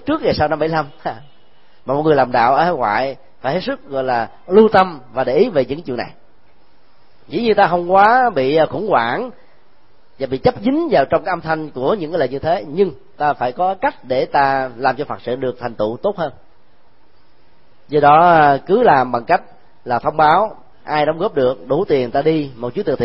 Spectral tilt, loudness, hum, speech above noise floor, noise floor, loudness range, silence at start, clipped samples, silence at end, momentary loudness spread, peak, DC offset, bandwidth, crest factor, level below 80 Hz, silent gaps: -9 dB/octave; -16 LUFS; none; 39 dB; -55 dBFS; 5 LU; 0.05 s; under 0.1%; 0 s; 12 LU; 0 dBFS; 1%; 5.8 kHz; 16 dB; -48 dBFS; none